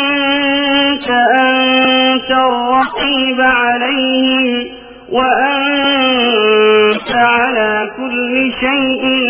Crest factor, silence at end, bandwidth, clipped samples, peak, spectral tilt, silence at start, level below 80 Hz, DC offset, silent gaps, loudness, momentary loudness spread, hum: 12 dB; 0 s; 5.2 kHz; under 0.1%; 0 dBFS; -7 dB/octave; 0 s; -46 dBFS; under 0.1%; none; -12 LUFS; 5 LU; none